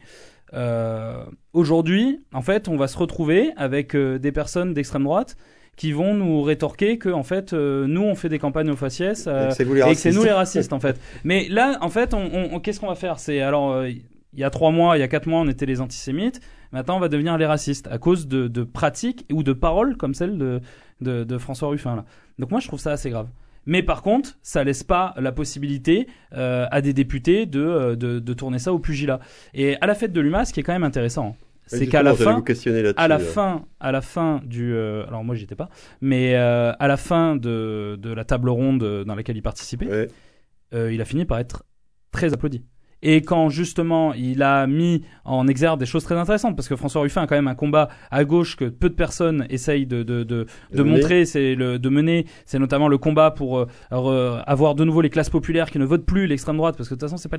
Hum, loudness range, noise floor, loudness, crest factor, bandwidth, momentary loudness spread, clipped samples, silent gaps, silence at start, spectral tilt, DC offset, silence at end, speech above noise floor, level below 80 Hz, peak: none; 5 LU; -48 dBFS; -21 LUFS; 18 dB; 11 kHz; 10 LU; under 0.1%; none; 0.15 s; -6.5 dB/octave; 0.2%; 0 s; 27 dB; -38 dBFS; -2 dBFS